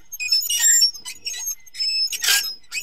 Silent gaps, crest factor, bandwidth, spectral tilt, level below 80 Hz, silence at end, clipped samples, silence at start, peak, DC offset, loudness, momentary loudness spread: none; 18 dB; 16.5 kHz; 5 dB/octave; -64 dBFS; 0 s; under 0.1%; 0.1 s; -4 dBFS; 0.7%; -18 LUFS; 14 LU